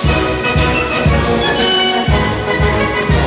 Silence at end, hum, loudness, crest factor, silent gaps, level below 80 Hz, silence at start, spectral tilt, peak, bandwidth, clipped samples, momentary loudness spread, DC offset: 0 s; none; -13 LUFS; 12 dB; none; -22 dBFS; 0 s; -9.5 dB/octave; 0 dBFS; 4 kHz; under 0.1%; 3 LU; under 0.1%